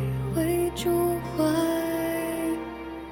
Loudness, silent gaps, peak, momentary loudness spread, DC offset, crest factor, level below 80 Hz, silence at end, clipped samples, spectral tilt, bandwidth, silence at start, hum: -27 LUFS; none; -12 dBFS; 7 LU; under 0.1%; 14 dB; -46 dBFS; 0 s; under 0.1%; -6 dB/octave; over 20 kHz; 0 s; none